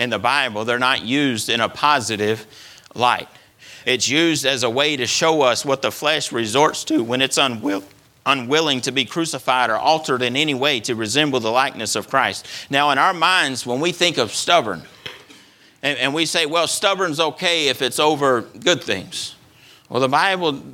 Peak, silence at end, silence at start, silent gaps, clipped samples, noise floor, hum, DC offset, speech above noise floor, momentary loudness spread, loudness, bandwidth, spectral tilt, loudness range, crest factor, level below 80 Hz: 0 dBFS; 0 s; 0 s; none; under 0.1%; -49 dBFS; none; under 0.1%; 30 dB; 8 LU; -18 LUFS; 18.5 kHz; -2.5 dB/octave; 2 LU; 18 dB; -64 dBFS